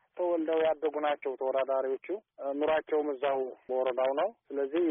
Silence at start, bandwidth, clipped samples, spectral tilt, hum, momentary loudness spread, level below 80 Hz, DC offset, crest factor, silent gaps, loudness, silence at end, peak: 0.15 s; 3.8 kHz; under 0.1%; 1 dB/octave; none; 6 LU; -74 dBFS; under 0.1%; 12 dB; none; -31 LUFS; 0 s; -18 dBFS